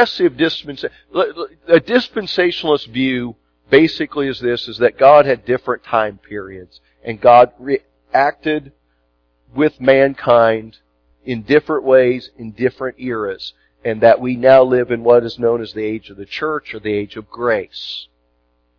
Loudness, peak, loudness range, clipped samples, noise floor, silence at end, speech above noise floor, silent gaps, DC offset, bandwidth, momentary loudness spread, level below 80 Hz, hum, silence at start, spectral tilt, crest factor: -15 LUFS; 0 dBFS; 4 LU; under 0.1%; -62 dBFS; 0.75 s; 47 dB; none; under 0.1%; 5.4 kHz; 17 LU; -52 dBFS; 60 Hz at -50 dBFS; 0 s; -7 dB/octave; 16 dB